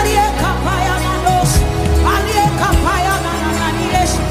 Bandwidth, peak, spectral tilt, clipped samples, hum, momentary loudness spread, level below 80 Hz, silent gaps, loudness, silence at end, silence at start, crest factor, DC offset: 16 kHz; -2 dBFS; -4.5 dB/octave; under 0.1%; none; 3 LU; -20 dBFS; none; -15 LUFS; 0 s; 0 s; 12 dB; under 0.1%